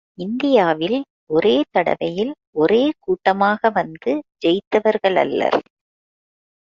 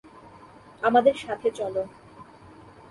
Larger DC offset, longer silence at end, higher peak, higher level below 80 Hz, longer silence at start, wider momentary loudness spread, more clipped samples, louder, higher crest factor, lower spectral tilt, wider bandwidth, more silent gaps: neither; first, 1.05 s vs 0.65 s; first, -2 dBFS vs -8 dBFS; about the same, -60 dBFS vs -62 dBFS; second, 0.2 s vs 0.8 s; second, 7 LU vs 12 LU; neither; first, -19 LUFS vs -24 LUFS; about the same, 16 dB vs 20 dB; first, -6.5 dB/octave vs -5 dB/octave; second, 7.4 kHz vs 11.5 kHz; first, 1.10-1.27 s, 2.47-2.53 s, 4.67-4.71 s vs none